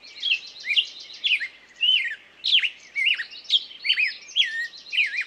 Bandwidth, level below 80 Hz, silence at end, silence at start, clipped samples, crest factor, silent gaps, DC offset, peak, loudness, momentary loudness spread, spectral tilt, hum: 13 kHz; -78 dBFS; 0 s; 0.05 s; under 0.1%; 18 dB; none; under 0.1%; -8 dBFS; -22 LUFS; 8 LU; 3.5 dB/octave; none